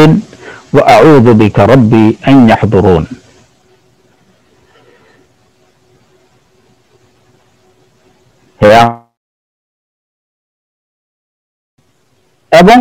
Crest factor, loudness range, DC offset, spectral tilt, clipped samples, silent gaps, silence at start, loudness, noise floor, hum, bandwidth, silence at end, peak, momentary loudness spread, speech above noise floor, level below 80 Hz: 10 dB; 10 LU; under 0.1%; -7 dB/octave; 6%; 9.17-11.77 s; 0 s; -6 LUFS; -55 dBFS; none; 17 kHz; 0 s; 0 dBFS; 9 LU; 50 dB; -38 dBFS